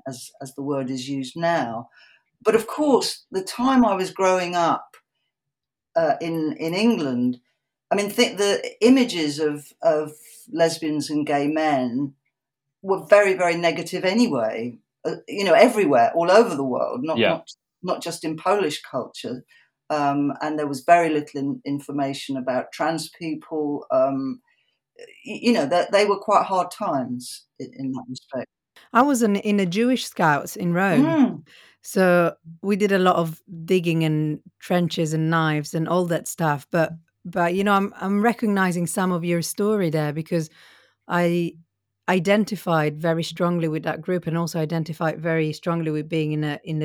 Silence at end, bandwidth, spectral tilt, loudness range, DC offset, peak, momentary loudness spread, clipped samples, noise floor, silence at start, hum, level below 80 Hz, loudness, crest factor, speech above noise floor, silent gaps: 0 s; 18 kHz; -5.5 dB/octave; 5 LU; under 0.1%; 0 dBFS; 13 LU; under 0.1%; -86 dBFS; 0.05 s; none; -68 dBFS; -22 LUFS; 22 dB; 64 dB; none